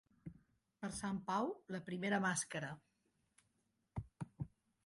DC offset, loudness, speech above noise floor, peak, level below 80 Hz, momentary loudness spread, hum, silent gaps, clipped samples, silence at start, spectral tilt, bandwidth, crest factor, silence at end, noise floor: under 0.1%; -43 LUFS; 42 dB; -26 dBFS; -68 dBFS; 18 LU; none; none; under 0.1%; 0.25 s; -4.5 dB/octave; 11.5 kHz; 18 dB; 0.4 s; -83 dBFS